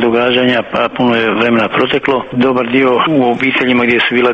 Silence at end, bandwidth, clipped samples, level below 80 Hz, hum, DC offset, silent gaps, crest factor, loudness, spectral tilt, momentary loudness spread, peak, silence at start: 0 s; 7 kHz; under 0.1%; -48 dBFS; none; under 0.1%; none; 12 dB; -12 LUFS; -7 dB/octave; 3 LU; 0 dBFS; 0 s